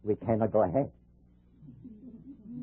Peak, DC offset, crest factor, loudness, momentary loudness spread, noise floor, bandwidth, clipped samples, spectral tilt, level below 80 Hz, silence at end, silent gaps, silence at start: -14 dBFS; under 0.1%; 20 dB; -29 LUFS; 23 LU; -61 dBFS; 3.3 kHz; under 0.1%; -13 dB/octave; -56 dBFS; 0 s; none; 0.05 s